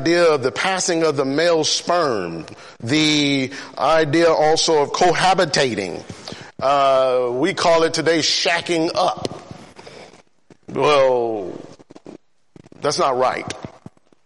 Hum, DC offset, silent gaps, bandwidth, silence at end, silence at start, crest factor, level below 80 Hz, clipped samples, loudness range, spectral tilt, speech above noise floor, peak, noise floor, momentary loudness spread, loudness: none; under 0.1%; none; 11.5 kHz; 0.55 s; 0 s; 16 dB; -56 dBFS; under 0.1%; 6 LU; -3.5 dB/octave; 35 dB; -4 dBFS; -52 dBFS; 16 LU; -18 LUFS